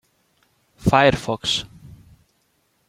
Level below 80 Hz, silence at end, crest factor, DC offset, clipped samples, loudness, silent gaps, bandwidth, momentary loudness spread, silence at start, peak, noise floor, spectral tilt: -44 dBFS; 1 s; 22 dB; under 0.1%; under 0.1%; -19 LUFS; none; 15.5 kHz; 9 LU; 0.8 s; -2 dBFS; -66 dBFS; -4.5 dB/octave